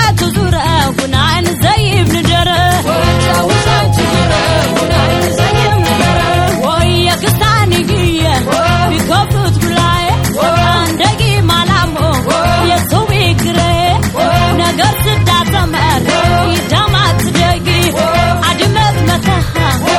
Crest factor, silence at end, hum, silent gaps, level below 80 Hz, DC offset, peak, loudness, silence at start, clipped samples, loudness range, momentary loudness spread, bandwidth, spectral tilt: 10 dB; 0 s; none; none; -24 dBFS; under 0.1%; 0 dBFS; -11 LUFS; 0 s; under 0.1%; 0 LU; 2 LU; 18.5 kHz; -5 dB/octave